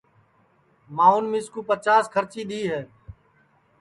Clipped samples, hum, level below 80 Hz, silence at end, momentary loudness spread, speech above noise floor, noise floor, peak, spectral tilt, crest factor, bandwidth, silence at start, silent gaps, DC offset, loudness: under 0.1%; none; -60 dBFS; 0.7 s; 14 LU; 40 dB; -62 dBFS; -4 dBFS; -5 dB/octave; 20 dB; 11.5 kHz; 0.9 s; none; under 0.1%; -22 LUFS